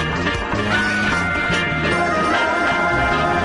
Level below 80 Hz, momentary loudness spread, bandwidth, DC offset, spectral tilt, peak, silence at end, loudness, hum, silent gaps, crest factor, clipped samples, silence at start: -36 dBFS; 3 LU; 11.5 kHz; under 0.1%; -5 dB/octave; -6 dBFS; 0 s; -18 LUFS; none; none; 12 dB; under 0.1%; 0 s